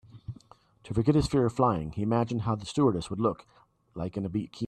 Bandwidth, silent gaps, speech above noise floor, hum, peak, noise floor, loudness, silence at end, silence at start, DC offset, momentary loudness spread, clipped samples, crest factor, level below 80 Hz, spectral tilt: 11.5 kHz; none; 29 dB; none; -10 dBFS; -56 dBFS; -28 LUFS; 0 s; 0.15 s; under 0.1%; 20 LU; under 0.1%; 18 dB; -50 dBFS; -7.5 dB/octave